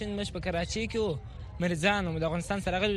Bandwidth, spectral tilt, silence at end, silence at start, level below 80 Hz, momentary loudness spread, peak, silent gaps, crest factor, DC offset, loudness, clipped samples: 12.5 kHz; -5 dB/octave; 0 s; 0 s; -44 dBFS; 7 LU; -10 dBFS; none; 20 dB; under 0.1%; -31 LUFS; under 0.1%